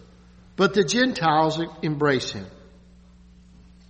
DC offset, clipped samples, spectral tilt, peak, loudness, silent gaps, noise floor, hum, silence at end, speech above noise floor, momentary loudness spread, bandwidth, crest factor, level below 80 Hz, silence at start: under 0.1%; under 0.1%; -4.5 dB/octave; -6 dBFS; -22 LUFS; none; -50 dBFS; none; 1.35 s; 28 dB; 16 LU; 8.4 kHz; 18 dB; -54 dBFS; 0.6 s